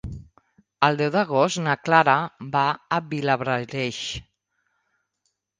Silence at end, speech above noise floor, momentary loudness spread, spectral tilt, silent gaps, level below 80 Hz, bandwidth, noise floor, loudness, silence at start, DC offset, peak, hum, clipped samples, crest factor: 1.35 s; 53 dB; 13 LU; -5 dB/octave; none; -52 dBFS; 10 kHz; -76 dBFS; -22 LUFS; 0.05 s; under 0.1%; -2 dBFS; none; under 0.1%; 22 dB